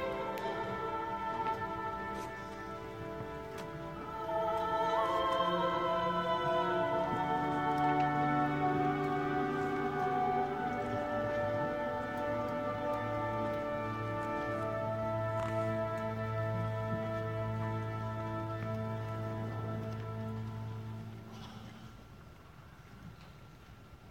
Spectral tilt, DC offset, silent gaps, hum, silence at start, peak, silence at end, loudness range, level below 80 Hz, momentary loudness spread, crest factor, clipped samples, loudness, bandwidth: -7 dB/octave; under 0.1%; none; none; 0 s; -20 dBFS; 0 s; 10 LU; -58 dBFS; 17 LU; 16 dB; under 0.1%; -35 LUFS; 16.5 kHz